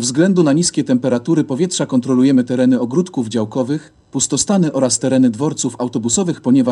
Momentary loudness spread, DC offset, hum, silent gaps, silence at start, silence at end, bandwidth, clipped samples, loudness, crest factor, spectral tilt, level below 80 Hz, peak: 7 LU; under 0.1%; none; none; 0 s; 0 s; 11 kHz; under 0.1%; -16 LUFS; 14 dB; -5 dB/octave; -56 dBFS; -2 dBFS